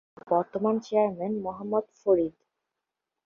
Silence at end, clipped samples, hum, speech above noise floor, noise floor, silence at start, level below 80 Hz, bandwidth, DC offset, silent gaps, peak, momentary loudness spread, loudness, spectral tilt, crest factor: 0.95 s; under 0.1%; none; 59 dB; -86 dBFS; 0.25 s; -66 dBFS; 7.2 kHz; under 0.1%; none; -12 dBFS; 6 LU; -28 LUFS; -8 dB/octave; 18 dB